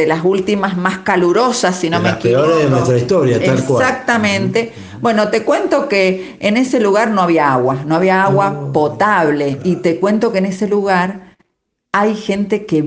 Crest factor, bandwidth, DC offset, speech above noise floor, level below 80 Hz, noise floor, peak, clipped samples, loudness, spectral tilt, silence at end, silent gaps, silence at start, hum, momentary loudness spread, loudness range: 14 dB; 9.8 kHz; under 0.1%; 57 dB; -54 dBFS; -70 dBFS; 0 dBFS; under 0.1%; -14 LUFS; -6 dB/octave; 0 s; none; 0 s; none; 5 LU; 2 LU